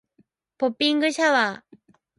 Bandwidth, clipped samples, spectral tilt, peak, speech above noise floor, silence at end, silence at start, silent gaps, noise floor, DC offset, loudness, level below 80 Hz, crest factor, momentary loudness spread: 11.5 kHz; under 0.1%; -2.5 dB/octave; -8 dBFS; 43 dB; 0.65 s; 0.6 s; none; -65 dBFS; under 0.1%; -22 LUFS; -76 dBFS; 18 dB; 8 LU